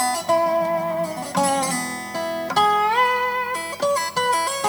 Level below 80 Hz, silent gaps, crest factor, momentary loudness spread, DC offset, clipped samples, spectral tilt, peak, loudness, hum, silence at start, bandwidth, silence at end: -62 dBFS; none; 14 dB; 8 LU; under 0.1%; under 0.1%; -2.5 dB/octave; -6 dBFS; -21 LUFS; 50 Hz at -55 dBFS; 0 s; over 20 kHz; 0 s